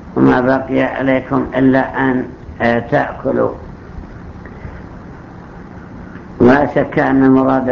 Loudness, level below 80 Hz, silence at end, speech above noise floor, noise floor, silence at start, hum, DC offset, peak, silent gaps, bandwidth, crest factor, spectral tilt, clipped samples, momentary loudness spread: -14 LUFS; -38 dBFS; 0 s; 20 dB; -33 dBFS; 0 s; none; under 0.1%; 0 dBFS; none; 6.4 kHz; 16 dB; -9 dB/octave; under 0.1%; 23 LU